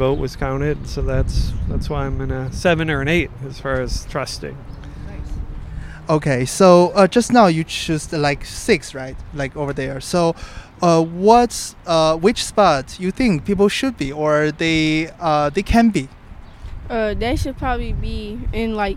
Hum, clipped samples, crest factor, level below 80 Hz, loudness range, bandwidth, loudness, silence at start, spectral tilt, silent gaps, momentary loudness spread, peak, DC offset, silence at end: none; under 0.1%; 18 dB; -30 dBFS; 6 LU; 16 kHz; -18 LUFS; 0 s; -5.5 dB/octave; none; 18 LU; 0 dBFS; under 0.1%; 0 s